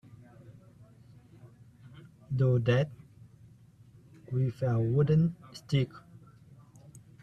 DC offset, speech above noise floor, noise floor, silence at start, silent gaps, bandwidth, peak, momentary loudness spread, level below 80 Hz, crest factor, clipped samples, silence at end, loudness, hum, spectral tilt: under 0.1%; 29 dB; -57 dBFS; 0.5 s; none; 8.6 kHz; -14 dBFS; 22 LU; -62 dBFS; 20 dB; under 0.1%; 0.25 s; -29 LUFS; none; -8.5 dB/octave